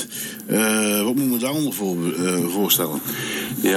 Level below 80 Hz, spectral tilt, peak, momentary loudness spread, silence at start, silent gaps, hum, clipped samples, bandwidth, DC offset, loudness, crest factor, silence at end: -64 dBFS; -3.5 dB/octave; -2 dBFS; 7 LU; 0 s; none; none; under 0.1%; 20 kHz; under 0.1%; -21 LUFS; 20 dB; 0 s